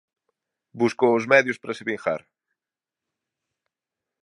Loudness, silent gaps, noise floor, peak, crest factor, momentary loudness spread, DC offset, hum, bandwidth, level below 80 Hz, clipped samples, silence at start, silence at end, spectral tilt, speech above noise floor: -22 LUFS; none; -90 dBFS; -2 dBFS; 24 dB; 12 LU; under 0.1%; none; 11.5 kHz; -74 dBFS; under 0.1%; 0.75 s; 2.05 s; -5.5 dB/octave; 68 dB